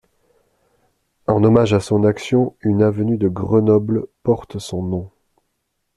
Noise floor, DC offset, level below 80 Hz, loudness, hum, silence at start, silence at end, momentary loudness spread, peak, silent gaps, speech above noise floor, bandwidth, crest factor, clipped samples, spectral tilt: -72 dBFS; under 0.1%; -50 dBFS; -18 LUFS; none; 1.3 s; 0.9 s; 11 LU; -2 dBFS; none; 55 dB; 12 kHz; 16 dB; under 0.1%; -8 dB/octave